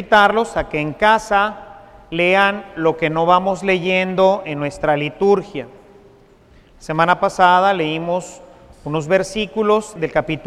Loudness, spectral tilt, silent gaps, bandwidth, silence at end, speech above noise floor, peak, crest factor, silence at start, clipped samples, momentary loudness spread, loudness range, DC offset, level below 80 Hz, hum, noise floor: -17 LUFS; -5 dB/octave; none; 13.5 kHz; 0 s; 32 dB; 0 dBFS; 18 dB; 0 s; under 0.1%; 11 LU; 3 LU; under 0.1%; -46 dBFS; none; -48 dBFS